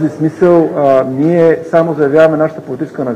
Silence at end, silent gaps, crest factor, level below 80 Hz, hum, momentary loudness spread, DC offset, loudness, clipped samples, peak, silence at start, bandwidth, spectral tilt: 0 s; none; 10 dB; -54 dBFS; none; 8 LU; under 0.1%; -11 LUFS; under 0.1%; 0 dBFS; 0 s; 9.8 kHz; -8.5 dB/octave